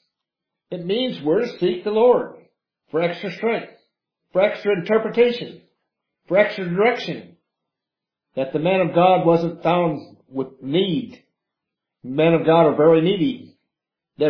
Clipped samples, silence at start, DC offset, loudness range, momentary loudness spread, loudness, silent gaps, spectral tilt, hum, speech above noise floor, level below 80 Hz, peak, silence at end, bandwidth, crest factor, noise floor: under 0.1%; 0.7 s; under 0.1%; 3 LU; 15 LU; -20 LUFS; none; -8 dB/octave; none; 67 dB; -66 dBFS; -2 dBFS; 0 s; 5.4 kHz; 18 dB; -86 dBFS